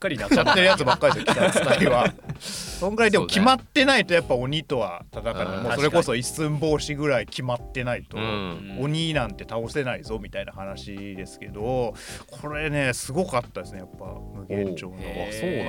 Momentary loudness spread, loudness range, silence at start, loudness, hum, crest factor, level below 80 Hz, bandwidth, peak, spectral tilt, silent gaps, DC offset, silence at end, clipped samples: 17 LU; 9 LU; 0 s; -23 LUFS; none; 18 dB; -44 dBFS; 18.5 kHz; -6 dBFS; -4.5 dB/octave; none; under 0.1%; 0 s; under 0.1%